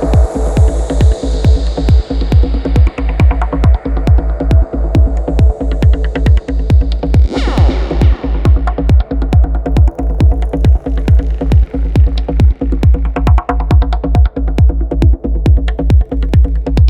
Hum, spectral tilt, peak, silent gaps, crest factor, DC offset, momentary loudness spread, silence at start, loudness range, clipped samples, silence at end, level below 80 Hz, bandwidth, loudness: none; -8.5 dB/octave; 0 dBFS; none; 10 dB; under 0.1%; 1 LU; 0 s; 0 LU; under 0.1%; 0 s; -12 dBFS; 8.2 kHz; -13 LUFS